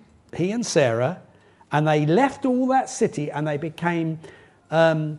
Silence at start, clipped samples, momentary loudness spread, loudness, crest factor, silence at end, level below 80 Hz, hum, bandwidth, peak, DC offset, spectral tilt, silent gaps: 0.35 s; under 0.1%; 8 LU; -22 LUFS; 18 dB; 0 s; -62 dBFS; none; 11.5 kHz; -4 dBFS; under 0.1%; -6 dB/octave; none